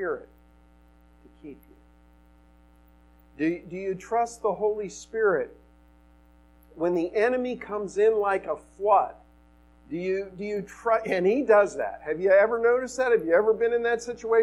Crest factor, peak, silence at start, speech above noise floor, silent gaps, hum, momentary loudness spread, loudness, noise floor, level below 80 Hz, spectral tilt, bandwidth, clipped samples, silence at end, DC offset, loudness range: 18 dB; -8 dBFS; 0 s; 32 dB; none; none; 12 LU; -25 LUFS; -56 dBFS; -58 dBFS; -5.5 dB/octave; 11.5 kHz; under 0.1%; 0 s; under 0.1%; 10 LU